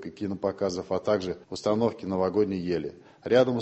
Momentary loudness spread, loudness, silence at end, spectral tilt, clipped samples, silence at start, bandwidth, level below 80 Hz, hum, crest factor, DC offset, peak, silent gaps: 10 LU; -28 LUFS; 0 s; -6.5 dB/octave; under 0.1%; 0 s; 8.4 kHz; -56 dBFS; none; 18 dB; under 0.1%; -8 dBFS; none